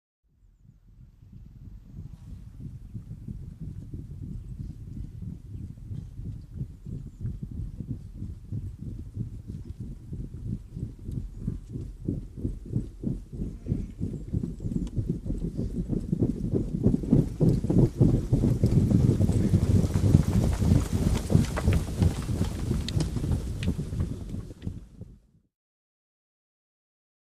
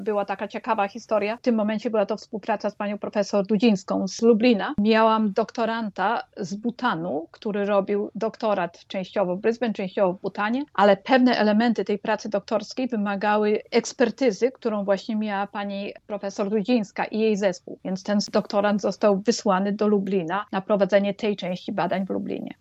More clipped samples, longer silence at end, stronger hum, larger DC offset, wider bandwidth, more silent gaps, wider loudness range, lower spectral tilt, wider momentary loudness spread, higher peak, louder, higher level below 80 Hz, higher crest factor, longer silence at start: neither; first, 2.2 s vs 0.1 s; neither; neither; first, 15 kHz vs 8.2 kHz; neither; first, 17 LU vs 4 LU; first, -8 dB/octave vs -5.5 dB/octave; first, 18 LU vs 10 LU; about the same, -4 dBFS vs -6 dBFS; second, -28 LUFS vs -24 LUFS; first, -36 dBFS vs -66 dBFS; first, 26 dB vs 18 dB; first, 0.95 s vs 0 s